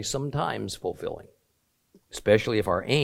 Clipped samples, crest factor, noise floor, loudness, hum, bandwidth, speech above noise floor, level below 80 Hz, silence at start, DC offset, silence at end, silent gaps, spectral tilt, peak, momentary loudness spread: under 0.1%; 22 dB; -72 dBFS; -27 LUFS; none; 16.5 kHz; 45 dB; -54 dBFS; 0 s; under 0.1%; 0 s; none; -5 dB/octave; -6 dBFS; 14 LU